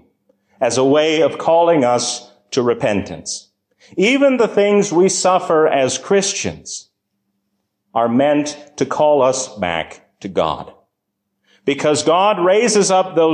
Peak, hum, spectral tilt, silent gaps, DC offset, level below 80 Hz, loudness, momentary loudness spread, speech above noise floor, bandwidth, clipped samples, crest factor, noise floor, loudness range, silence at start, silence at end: -4 dBFS; none; -4 dB/octave; none; under 0.1%; -52 dBFS; -16 LUFS; 13 LU; 59 dB; 10.5 kHz; under 0.1%; 12 dB; -74 dBFS; 4 LU; 0.6 s; 0 s